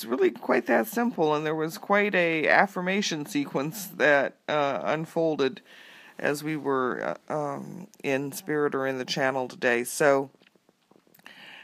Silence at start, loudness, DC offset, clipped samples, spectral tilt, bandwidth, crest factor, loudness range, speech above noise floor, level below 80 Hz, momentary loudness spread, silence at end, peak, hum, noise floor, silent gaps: 0 s; -26 LUFS; under 0.1%; under 0.1%; -4.5 dB/octave; 15.5 kHz; 24 dB; 5 LU; 36 dB; -82 dBFS; 10 LU; 0 s; -2 dBFS; none; -63 dBFS; none